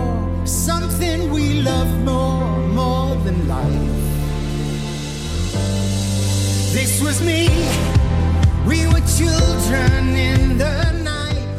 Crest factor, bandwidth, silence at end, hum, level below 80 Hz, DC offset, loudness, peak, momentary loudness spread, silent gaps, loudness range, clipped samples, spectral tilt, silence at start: 14 dB; 16 kHz; 0 s; none; -22 dBFS; under 0.1%; -18 LUFS; -4 dBFS; 6 LU; none; 4 LU; under 0.1%; -5 dB/octave; 0 s